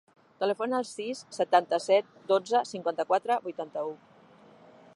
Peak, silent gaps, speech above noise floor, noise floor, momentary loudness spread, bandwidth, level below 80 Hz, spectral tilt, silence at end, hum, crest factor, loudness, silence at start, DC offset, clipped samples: -8 dBFS; none; 28 dB; -56 dBFS; 11 LU; 11.5 kHz; -84 dBFS; -4 dB/octave; 1 s; none; 20 dB; -29 LUFS; 0.4 s; under 0.1%; under 0.1%